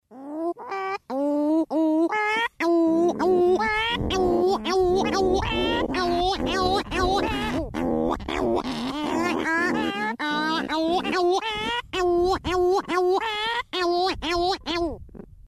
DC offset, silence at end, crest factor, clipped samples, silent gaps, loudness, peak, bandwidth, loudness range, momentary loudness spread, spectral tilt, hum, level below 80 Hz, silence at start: under 0.1%; 0.05 s; 14 dB; under 0.1%; none; -24 LUFS; -10 dBFS; 13 kHz; 3 LU; 6 LU; -5 dB/octave; none; -42 dBFS; 0.1 s